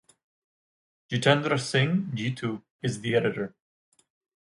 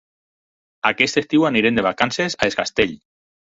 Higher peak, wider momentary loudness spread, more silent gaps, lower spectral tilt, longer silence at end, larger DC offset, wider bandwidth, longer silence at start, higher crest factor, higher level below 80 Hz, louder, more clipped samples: about the same, -4 dBFS vs -2 dBFS; first, 11 LU vs 5 LU; first, 2.70-2.79 s vs none; first, -5.5 dB/octave vs -4 dB/octave; first, 0.95 s vs 0.45 s; neither; first, 11.5 kHz vs 8 kHz; first, 1.1 s vs 0.85 s; about the same, 24 dB vs 20 dB; second, -66 dBFS vs -52 dBFS; second, -27 LUFS vs -19 LUFS; neither